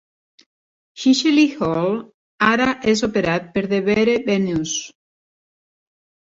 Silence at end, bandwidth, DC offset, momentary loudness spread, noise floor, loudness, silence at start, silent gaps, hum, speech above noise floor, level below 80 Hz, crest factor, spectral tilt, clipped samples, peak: 1.3 s; 7.8 kHz; under 0.1%; 7 LU; under -90 dBFS; -19 LUFS; 0.95 s; 2.14-2.38 s; none; over 72 dB; -54 dBFS; 16 dB; -4.5 dB/octave; under 0.1%; -4 dBFS